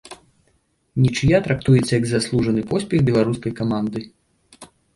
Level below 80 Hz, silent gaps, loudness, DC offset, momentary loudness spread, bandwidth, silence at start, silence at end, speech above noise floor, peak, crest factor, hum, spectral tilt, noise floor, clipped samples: -44 dBFS; none; -20 LUFS; under 0.1%; 8 LU; 11.5 kHz; 0.05 s; 0.3 s; 46 dB; -4 dBFS; 16 dB; none; -6.5 dB/octave; -64 dBFS; under 0.1%